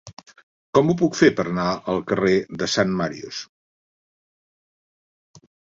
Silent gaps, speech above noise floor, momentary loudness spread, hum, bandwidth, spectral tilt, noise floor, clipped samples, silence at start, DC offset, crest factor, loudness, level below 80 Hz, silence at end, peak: 0.13-0.17 s, 0.43-0.73 s, 3.49-5.34 s; over 69 dB; 15 LU; none; 7.8 kHz; -5.5 dB/octave; under -90 dBFS; under 0.1%; 0.05 s; under 0.1%; 22 dB; -21 LUFS; -56 dBFS; 0.4 s; -2 dBFS